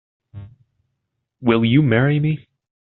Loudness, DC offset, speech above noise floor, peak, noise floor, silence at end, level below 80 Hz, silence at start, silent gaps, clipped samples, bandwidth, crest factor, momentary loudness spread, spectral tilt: -18 LUFS; under 0.1%; 60 dB; -2 dBFS; -76 dBFS; 0.5 s; -54 dBFS; 0.35 s; none; under 0.1%; 4.1 kHz; 18 dB; 9 LU; -6.5 dB/octave